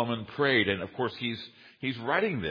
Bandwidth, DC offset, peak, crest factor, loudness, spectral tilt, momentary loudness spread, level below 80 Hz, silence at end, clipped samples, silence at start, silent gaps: 5.2 kHz; under 0.1%; -12 dBFS; 18 dB; -29 LUFS; -7.5 dB/octave; 12 LU; -62 dBFS; 0 s; under 0.1%; 0 s; none